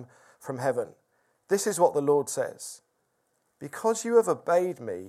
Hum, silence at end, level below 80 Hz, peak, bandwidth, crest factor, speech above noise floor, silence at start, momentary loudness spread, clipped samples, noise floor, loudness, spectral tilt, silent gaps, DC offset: none; 0 s; -80 dBFS; -8 dBFS; 15 kHz; 20 dB; 48 dB; 0 s; 17 LU; under 0.1%; -74 dBFS; -26 LUFS; -4.5 dB/octave; none; under 0.1%